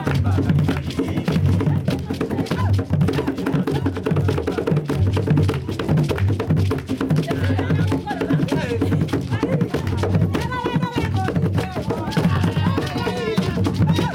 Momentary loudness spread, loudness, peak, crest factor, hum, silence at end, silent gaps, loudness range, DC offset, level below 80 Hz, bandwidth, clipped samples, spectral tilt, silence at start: 4 LU; -21 LUFS; -8 dBFS; 12 dB; none; 0 s; none; 1 LU; under 0.1%; -42 dBFS; 16 kHz; under 0.1%; -7.5 dB/octave; 0 s